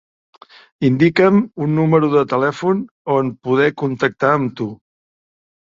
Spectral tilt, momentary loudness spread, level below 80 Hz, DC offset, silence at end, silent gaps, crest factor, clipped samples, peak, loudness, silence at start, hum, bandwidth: -8 dB/octave; 7 LU; -58 dBFS; under 0.1%; 1 s; 2.91-3.05 s; 18 dB; under 0.1%; 0 dBFS; -16 LUFS; 0.8 s; none; 7.6 kHz